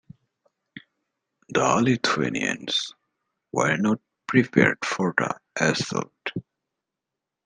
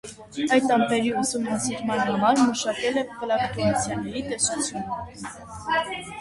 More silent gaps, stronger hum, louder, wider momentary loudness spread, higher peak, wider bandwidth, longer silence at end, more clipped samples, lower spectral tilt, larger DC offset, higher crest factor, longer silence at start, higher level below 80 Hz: neither; neither; about the same, -24 LUFS vs -24 LUFS; about the same, 11 LU vs 13 LU; first, -2 dBFS vs -8 dBFS; second, 10 kHz vs 11.5 kHz; first, 1.05 s vs 0 s; neither; about the same, -4.5 dB/octave vs -3.5 dB/octave; neither; first, 24 dB vs 18 dB; first, 0.75 s vs 0.05 s; second, -64 dBFS vs -54 dBFS